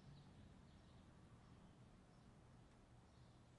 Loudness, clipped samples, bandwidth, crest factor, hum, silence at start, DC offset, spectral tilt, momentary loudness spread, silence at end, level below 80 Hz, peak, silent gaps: -67 LUFS; under 0.1%; 10.5 kHz; 14 dB; none; 0 s; under 0.1%; -6 dB/octave; 3 LU; 0 s; -74 dBFS; -52 dBFS; none